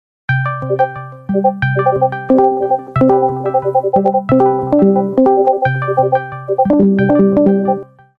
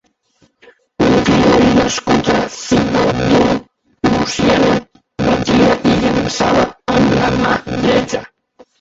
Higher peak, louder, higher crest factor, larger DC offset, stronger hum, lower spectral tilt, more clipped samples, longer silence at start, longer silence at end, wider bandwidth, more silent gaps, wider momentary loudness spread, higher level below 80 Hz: about the same, 0 dBFS vs 0 dBFS; about the same, -13 LUFS vs -14 LUFS; about the same, 12 dB vs 14 dB; neither; neither; first, -10.5 dB/octave vs -5.5 dB/octave; neither; second, 0.3 s vs 1 s; second, 0.35 s vs 0.55 s; second, 5 kHz vs 8 kHz; neither; about the same, 7 LU vs 6 LU; second, -46 dBFS vs -36 dBFS